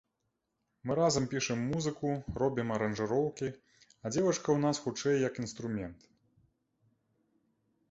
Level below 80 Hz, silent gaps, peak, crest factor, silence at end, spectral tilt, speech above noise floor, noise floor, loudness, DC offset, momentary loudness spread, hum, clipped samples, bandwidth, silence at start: -60 dBFS; none; -16 dBFS; 18 dB; 1.95 s; -5 dB/octave; 50 dB; -83 dBFS; -33 LUFS; under 0.1%; 10 LU; none; under 0.1%; 8.2 kHz; 0.85 s